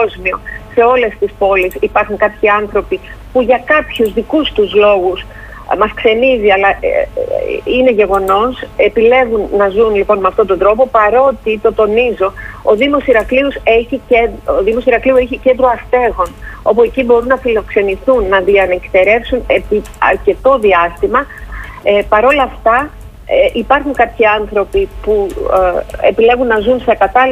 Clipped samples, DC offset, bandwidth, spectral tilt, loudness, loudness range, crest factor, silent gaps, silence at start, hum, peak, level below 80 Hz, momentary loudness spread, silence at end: under 0.1%; under 0.1%; 15.5 kHz; -6 dB/octave; -11 LUFS; 2 LU; 12 dB; none; 0 s; none; 0 dBFS; -32 dBFS; 7 LU; 0 s